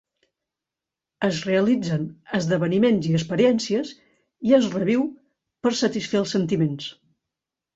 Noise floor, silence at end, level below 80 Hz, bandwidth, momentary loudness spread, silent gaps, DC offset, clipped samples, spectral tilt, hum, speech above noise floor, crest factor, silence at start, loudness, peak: -88 dBFS; 0.85 s; -62 dBFS; 8 kHz; 9 LU; none; under 0.1%; under 0.1%; -6 dB/octave; none; 66 dB; 18 dB; 1.2 s; -22 LUFS; -6 dBFS